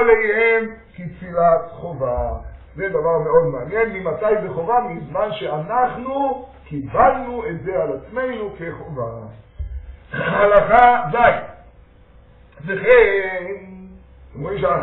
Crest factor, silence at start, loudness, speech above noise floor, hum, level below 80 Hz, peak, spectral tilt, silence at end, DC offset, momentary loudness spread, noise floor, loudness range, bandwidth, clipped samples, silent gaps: 18 dB; 0 s; -18 LUFS; 29 dB; none; -40 dBFS; 0 dBFS; -4.5 dB/octave; 0 s; under 0.1%; 20 LU; -48 dBFS; 6 LU; 4.1 kHz; under 0.1%; none